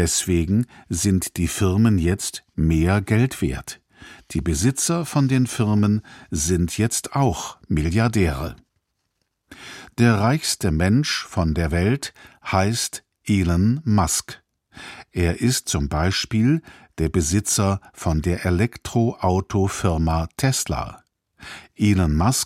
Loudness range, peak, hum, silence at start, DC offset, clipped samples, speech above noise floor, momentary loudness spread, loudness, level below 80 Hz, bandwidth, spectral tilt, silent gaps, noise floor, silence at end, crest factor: 2 LU; -4 dBFS; none; 0 s; under 0.1%; under 0.1%; 53 dB; 12 LU; -21 LUFS; -36 dBFS; 16 kHz; -5 dB/octave; none; -74 dBFS; 0 s; 18 dB